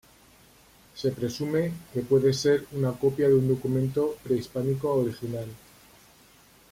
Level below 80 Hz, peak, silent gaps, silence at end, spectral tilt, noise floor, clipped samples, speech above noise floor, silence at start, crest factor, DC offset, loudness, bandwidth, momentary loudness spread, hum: -58 dBFS; -10 dBFS; none; 1.15 s; -7 dB/octave; -56 dBFS; under 0.1%; 31 dB; 0.95 s; 16 dB; under 0.1%; -26 LUFS; 16.5 kHz; 12 LU; none